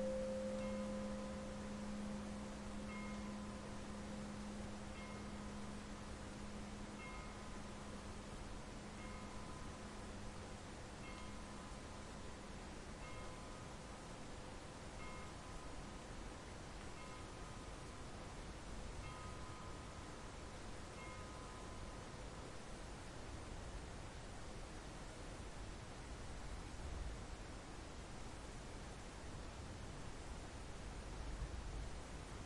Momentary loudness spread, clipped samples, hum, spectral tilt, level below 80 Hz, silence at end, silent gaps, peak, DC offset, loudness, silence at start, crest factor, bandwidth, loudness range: 5 LU; under 0.1%; none; -5 dB/octave; -56 dBFS; 0 s; none; -32 dBFS; under 0.1%; -51 LUFS; 0 s; 18 dB; 11.5 kHz; 4 LU